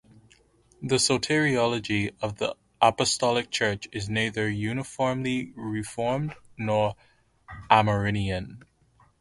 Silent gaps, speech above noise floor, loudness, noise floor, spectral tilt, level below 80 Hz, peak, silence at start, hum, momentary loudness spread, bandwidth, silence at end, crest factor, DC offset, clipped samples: none; 36 dB; -26 LUFS; -62 dBFS; -4.5 dB/octave; -52 dBFS; -2 dBFS; 0.8 s; none; 11 LU; 11.5 kHz; 0.6 s; 24 dB; under 0.1%; under 0.1%